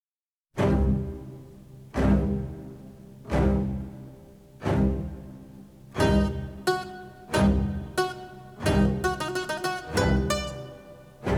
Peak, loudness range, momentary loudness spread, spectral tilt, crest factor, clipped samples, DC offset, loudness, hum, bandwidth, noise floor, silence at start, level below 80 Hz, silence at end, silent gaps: -10 dBFS; 3 LU; 21 LU; -6.5 dB/octave; 18 dB; under 0.1%; under 0.1%; -27 LUFS; none; 17 kHz; under -90 dBFS; 0.55 s; -34 dBFS; 0 s; none